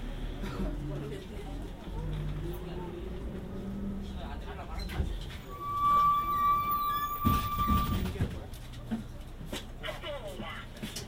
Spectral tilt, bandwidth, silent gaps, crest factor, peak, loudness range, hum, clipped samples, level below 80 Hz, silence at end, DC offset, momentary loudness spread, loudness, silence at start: -6 dB/octave; 16 kHz; none; 20 dB; -14 dBFS; 11 LU; none; under 0.1%; -40 dBFS; 0 s; under 0.1%; 14 LU; -34 LUFS; 0 s